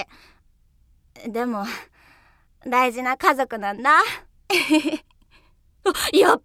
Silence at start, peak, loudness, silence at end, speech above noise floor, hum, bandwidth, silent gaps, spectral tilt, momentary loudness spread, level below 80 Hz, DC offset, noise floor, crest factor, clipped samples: 0 s; -2 dBFS; -21 LUFS; 0.05 s; 38 dB; none; 16.5 kHz; none; -2.5 dB/octave; 18 LU; -56 dBFS; under 0.1%; -58 dBFS; 22 dB; under 0.1%